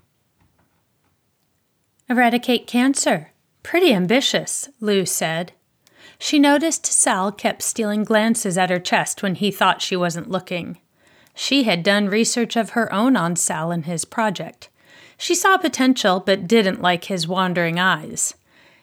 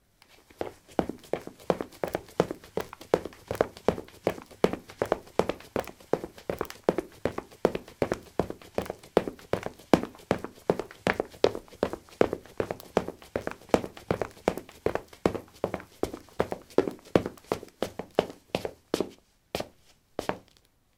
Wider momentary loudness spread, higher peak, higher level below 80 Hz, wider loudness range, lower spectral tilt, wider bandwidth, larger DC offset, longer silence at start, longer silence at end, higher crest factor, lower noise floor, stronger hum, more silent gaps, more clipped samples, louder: about the same, 9 LU vs 8 LU; about the same, -4 dBFS vs -2 dBFS; second, -70 dBFS vs -54 dBFS; about the same, 3 LU vs 3 LU; second, -3.5 dB/octave vs -6 dB/octave; about the same, 19 kHz vs 18 kHz; neither; first, 2.1 s vs 0.6 s; about the same, 0.5 s vs 0.6 s; second, 16 dB vs 30 dB; about the same, -67 dBFS vs -64 dBFS; neither; neither; neither; first, -19 LUFS vs -32 LUFS